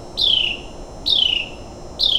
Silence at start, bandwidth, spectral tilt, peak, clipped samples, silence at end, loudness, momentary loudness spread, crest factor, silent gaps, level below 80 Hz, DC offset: 0 s; 16.5 kHz; -2 dB/octave; -4 dBFS; under 0.1%; 0 s; -17 LUFS; 21 LU; 16 dB; none; -40 dBFS; under 0.1%